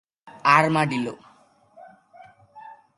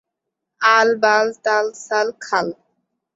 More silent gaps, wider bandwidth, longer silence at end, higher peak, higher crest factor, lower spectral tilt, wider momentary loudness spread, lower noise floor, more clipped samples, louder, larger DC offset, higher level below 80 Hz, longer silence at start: neither; first, 11.5 kHz vs 8 kHz; second, 0.25 s vs 0.6 s; about the same, -2 dBFS vs -2 dBFS; first, 24 dB vs 18 dB; first, -5.5 dB/octave vs -2.5 dB/octave; first, 12 LU vs 8 LU; second, -57 dBFS vs -80 dBFS; neither; second, -21 LUFS vs -17 LUFS; neither; about the same, -70 dBFS vs -70 dBFS; second, 0.25 s vs 0.6 s